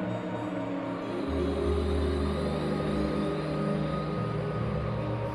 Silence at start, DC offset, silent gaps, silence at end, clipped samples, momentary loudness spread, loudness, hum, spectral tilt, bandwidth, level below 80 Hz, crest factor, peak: 0 s; under 0.1%; none; 0 s; under 0.1%; 4 LU; -31 LUFS; none; -8 dB/octave; 10.5 kHz; -40 dBFS; 14 dB; -16 dBFS